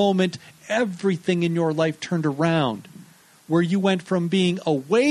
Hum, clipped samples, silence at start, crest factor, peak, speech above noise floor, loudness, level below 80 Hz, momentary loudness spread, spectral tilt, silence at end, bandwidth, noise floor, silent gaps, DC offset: none; under 0.1%; 0 s; 16 dB; -6 dBFS; 28 dB; -23 LUFS; -66 dBFS; 5 LU; -6.5 dB/octave; 0 s; 12.5 kHz; -49 dBFS; none; under 0.1%